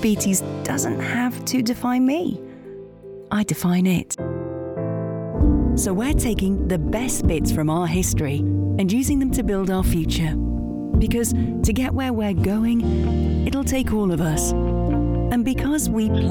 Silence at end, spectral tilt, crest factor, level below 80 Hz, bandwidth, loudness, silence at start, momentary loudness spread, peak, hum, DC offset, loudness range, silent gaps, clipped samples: 0 s; -5.5 dB/octave; 14 dB; -28 dBFS; 19 kHz; -21 LUFS; 0 s; 7 LU; -6 dBFS; none; under 0.1%; 2 LU; none; under 0.1%